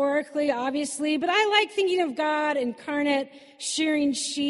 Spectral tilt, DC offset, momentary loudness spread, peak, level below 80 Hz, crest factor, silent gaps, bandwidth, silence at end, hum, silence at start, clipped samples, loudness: -1.5 dB/octave; under 0.1%; 7 LU; -8 dBFS; -72 dBFS; 18 dB; none; 11.5 kHz; 0 s; none; 0 s; under 0.1%; -25 LUFS